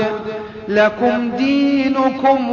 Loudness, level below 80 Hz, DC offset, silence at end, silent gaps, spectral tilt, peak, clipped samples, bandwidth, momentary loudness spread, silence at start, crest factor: -16 LUFS; -52 dBFS; under 0.1%; 0 s; none; -6 dB/octave; -2 dBFS; under 0.1%; 7 kHz; 10 LU; 0 s; 14 dB